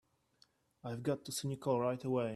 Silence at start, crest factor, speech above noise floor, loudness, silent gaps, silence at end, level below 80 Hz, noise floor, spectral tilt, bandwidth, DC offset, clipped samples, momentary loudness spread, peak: 0.85 s; 18 dB; 36 dB; -38 LUFS; none; 0 s; -76 dBFS; -72 dBFS; -5.5 dB/octave; 14.5 kHz; under 0.1%; under 0.1%; 9 LU; -20 dBFS